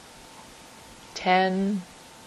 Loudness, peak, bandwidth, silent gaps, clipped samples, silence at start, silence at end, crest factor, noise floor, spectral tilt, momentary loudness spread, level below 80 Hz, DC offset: -25 LUFS; -10 dBFS; 13 kHz; none; under 0.1%; 0.05 s; 0 s; 20 dB; -48 dBFS; -5.5 dB/octave; 24 LU; -62 dBFS; under 0.1%